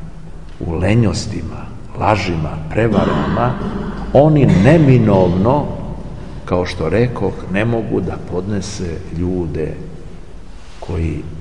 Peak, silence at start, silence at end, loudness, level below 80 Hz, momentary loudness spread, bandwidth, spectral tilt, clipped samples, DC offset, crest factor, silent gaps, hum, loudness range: 0 dBFS; 0 s; 0 s; -16 LUFS; -32 dBFS; 20 LU; 10.5 kHz; -7.5 dB/octave; under 0.1%; 3%; 16 dB; none; none; 9 LU